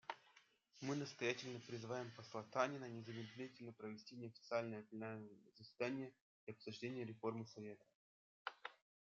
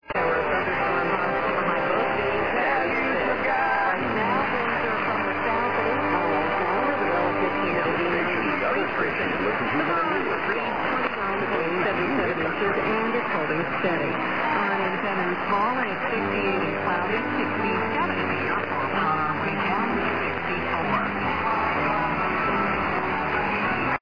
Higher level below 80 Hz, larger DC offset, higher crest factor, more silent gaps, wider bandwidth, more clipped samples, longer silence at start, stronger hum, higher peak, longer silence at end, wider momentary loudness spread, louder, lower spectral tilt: second, under -90 dBFS vs -52 dBFS; second, under 0.1% vs 0.6%; first, 24 dB vs 14 dB; first, 6.21-6.47 s, 7.95-8.45 s vs none; first, 7.4 kHz vs 5.2 kHz; neither; about the same, 0.05 s vs 0 s; neither; second, -24 dBFS vs -10 dBFS; first, 0.35 s vs 0 s; first, 14 LU vs 2 LU; second, -49 LUFS vs -24 LUFS; second, -4.5 dB/octave vs -7.5 dB/octave